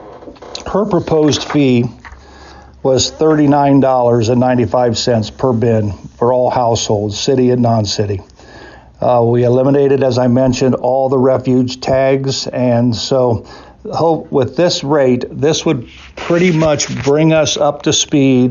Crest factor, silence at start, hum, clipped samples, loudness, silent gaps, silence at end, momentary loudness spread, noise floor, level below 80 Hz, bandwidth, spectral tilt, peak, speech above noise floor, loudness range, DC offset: 10 dB; 0 s; none; under 0.1%; -13 LUFS; none; 0 s; 7 LU; -37 dBFS; -42 dBFS; 7.6 kHz; -5.5 dB/octave; -2 dBFS; 25 dB; 2 LU; under 0.1%